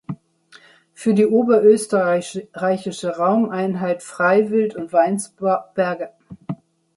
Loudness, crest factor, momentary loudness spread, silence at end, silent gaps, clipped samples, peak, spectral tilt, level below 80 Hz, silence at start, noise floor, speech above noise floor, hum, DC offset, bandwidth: -19 LUFS; 16 dB; 18 LU; 0.45 s; none; under 0.1%; -2 dBFS; -6 dB/octave; -66 dBFS; 0.1 s; -51 dBFS; 32 dB; none; under 0.1%; 11.5 kHz